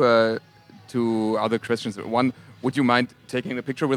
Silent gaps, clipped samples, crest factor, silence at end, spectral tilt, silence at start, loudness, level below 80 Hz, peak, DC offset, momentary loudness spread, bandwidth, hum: none; under 0.1%; 20 dB; 0 s; -6 dB/octave; 0 s; -24 LUFS; -70 dBFS; -2 dBFS; under 0.1%; 10 LU; 13 kHz; none